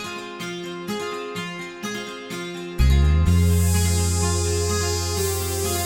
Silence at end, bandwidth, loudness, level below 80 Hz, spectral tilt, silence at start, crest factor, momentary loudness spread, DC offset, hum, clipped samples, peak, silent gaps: 0 s; 17 kHz; -23 LUFS; -28 dBFS; -4.5 dB/octave; 0 s; 14 dB; 13 LU; under 0.1%; none; under 0.1%; -8 dBFS; none